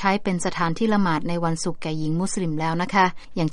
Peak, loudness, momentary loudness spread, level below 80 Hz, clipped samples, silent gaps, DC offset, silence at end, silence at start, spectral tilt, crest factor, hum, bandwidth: -4 dBFS; -23 LUFS; 7 LU; -46 dBFS; under 0.1%; none; under 0.1%; 0 s; 0 s; -5.5 dB/octave; 18 dB; none; 11.5 kHz